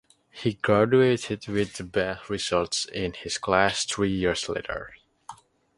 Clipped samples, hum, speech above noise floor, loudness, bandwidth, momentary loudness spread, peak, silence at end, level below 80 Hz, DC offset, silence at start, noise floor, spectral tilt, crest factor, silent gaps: under 0.1%; none; 22 dB; -25 LUFS; 11.5 kHz; 10 LU; -4 dBFS; 0.45 s; -52 dBFS; under 0.1%; 0.35 s; -48 dBFS; -4.5 dB/octave; 22 dB; none